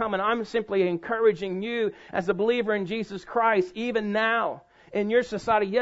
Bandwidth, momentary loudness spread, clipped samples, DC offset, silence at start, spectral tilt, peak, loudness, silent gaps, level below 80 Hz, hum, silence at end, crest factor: 8 kHz; 7 LU; under 0.1%; under 0.1%; 0 s; -6 dB/octave; -10 dBFS; -26 LUFS; none; -62 dBFS; none; 0 s; 16 dB